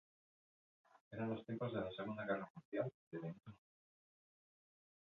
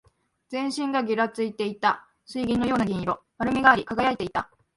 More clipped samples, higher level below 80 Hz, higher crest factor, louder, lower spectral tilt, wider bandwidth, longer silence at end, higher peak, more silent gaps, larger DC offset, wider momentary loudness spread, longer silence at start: neither; second, -80 dBFS vs -54 dBFS; about the same, 20 dB vs 24 dB; second, -46 LUFS vs -25 LUFS; about the same, -6 dB/octave vs -5.5 dB/octave; second, 6.6 kHz vs 11.5 kHz; first, 1.6 s vs 0.3 s; second, -28 dBFS vs -2 dBFS; first, 1.01-1.11 s, 2.50-2.55 s, 2.65-2.72 s, 2.94-3.11 s vs none; neither; about the same, 10 LU vs 12 LU; first, 0.95 s vs 0.5 s